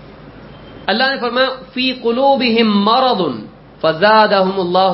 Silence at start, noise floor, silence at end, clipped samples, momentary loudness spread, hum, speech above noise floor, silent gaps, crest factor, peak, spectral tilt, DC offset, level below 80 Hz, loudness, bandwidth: 0 s; -36 dBFS; 0 s; under 0.1%; 9 LU; none; 23 dB; none; 14 dB; 0 dBFS; -10 dB/octave; under 0.1%; -50 dBFS; -14 LUFS; 5.8 kHz